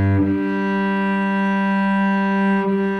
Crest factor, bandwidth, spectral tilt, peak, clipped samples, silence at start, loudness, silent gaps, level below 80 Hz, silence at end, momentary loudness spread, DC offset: 10 dB; 6 kHz; -8.5 dB/octave; -8 dBFS; under 0.1%; 0 s; -19 LUFS; none; -52 dBFS; 0 s; 2 LU; under 0.1%